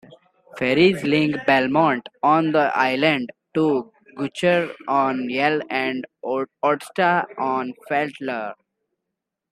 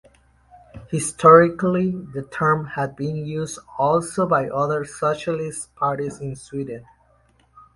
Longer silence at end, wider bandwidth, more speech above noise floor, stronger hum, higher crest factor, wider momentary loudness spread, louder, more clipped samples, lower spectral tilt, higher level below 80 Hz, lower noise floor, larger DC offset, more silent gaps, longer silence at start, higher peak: about the same, 1 s vs 0.95 s; first, 13 kHz vs 11.5 kHz; first, 62 dB vs 38 dB; neither; about the same, 18 dB vs 22 dB; second, 10 LU vs 17 LU; about the same, -21 LUFS vs -21 LUFS; neither; about the same, -6 dB/octave vs -6 dB/octave; second, -64 dBFS vs -54 dBFS; first, -82 dBFS vs -59 dBFS; neither; neither; second, 0.55 s vs 0.75 s; about the same, -2 dBFS vs 0 dBFS